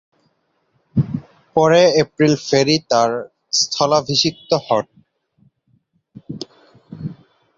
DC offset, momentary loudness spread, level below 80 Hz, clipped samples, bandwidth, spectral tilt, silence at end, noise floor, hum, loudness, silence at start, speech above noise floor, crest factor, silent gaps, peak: under 0.1%; 19 LU; -54 dBFS; under 0.1%; 7.8 kHz; -4.5 dB/octave; 0.45 s; -65 dBFS; none; -17 LUFS; 0.95 s; 49 dB; 18 dB; none; -2 dBFS